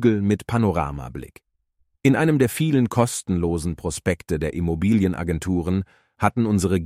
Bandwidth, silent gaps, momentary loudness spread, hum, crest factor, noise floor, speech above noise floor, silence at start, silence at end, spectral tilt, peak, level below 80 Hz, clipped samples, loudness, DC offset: 16 kHz; none; 8 LU; none; 16 dB; -69 dBFS; 48 dB; 0 s; 0 s; -6.5 dB/octave; -4 dBFS; -40 dBFS; under 0.1%; -22 LUFS; under 0.1%